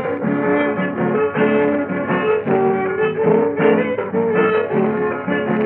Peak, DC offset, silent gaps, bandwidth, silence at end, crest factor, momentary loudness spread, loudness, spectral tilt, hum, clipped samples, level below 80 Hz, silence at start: -4 dBFS; under 0.1%; none; 4.1 kHz; 0 s; 14 dB; 4 LU; -18 LUFS; -11.5 dB/octave; none; under 0.1%; -58 dBFS; 0 s